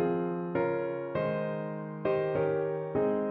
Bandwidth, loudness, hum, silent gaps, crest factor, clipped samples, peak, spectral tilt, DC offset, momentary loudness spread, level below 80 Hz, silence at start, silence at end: 4.5 kHz; -31 LUFS; none; none; 14 dB; under 0.1%; -16 dBFS; -11 dB/octave; under 0.1%; 5 LU; -66 dBFS; 0 s; 0 s